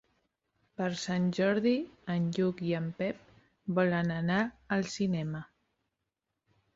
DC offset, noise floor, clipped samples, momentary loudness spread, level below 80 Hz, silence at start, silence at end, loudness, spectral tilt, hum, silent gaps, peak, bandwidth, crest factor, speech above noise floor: under 0.1%; -86 dBFS; under 0.1%; 9 LU; -66 dBFS; 0.8 s; 1.3 s; -32 LUFS; -6.5 dB/octave; none; none; -16 dBFS; 7.8 kHz; 18 dB; 55 dB